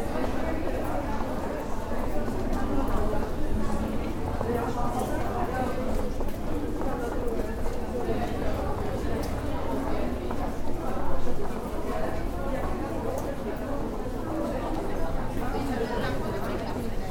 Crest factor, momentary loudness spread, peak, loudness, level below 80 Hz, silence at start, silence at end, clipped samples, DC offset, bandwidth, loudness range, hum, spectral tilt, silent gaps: 16 dB; 4 LU; -12 dBFS; -31 LUFS; -32 dBFS; 0 s; 0 s; under 0.1%; under 0.1%; 16 kHz; 2 LU; none; -6.5 dB/octave; none